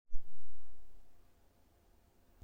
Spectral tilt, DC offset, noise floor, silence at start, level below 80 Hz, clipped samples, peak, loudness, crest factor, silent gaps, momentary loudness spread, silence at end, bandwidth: -7 dB/octave; under 0.1%; -68 dBFS; 0.05 s; -50 dBFS; under 0.1%; -18 dBFS; -62 LUFS; 14 dB; none; 14 LU; 0 s; 1.7 kHz